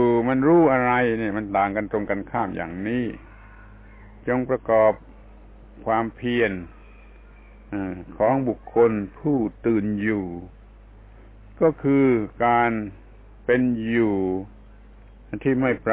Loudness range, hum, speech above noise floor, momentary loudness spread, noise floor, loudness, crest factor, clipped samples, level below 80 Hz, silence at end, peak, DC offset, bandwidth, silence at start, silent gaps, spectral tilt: 5 LU; none; 25 dB; 14 LU; -46 dBFS; -22 LUFS; 16 dB; under 0.1%; -46 dBFS; 0 s; -8 dBFS; under 0.1%; 4 kHz; 0 s; none; -11 dB/octave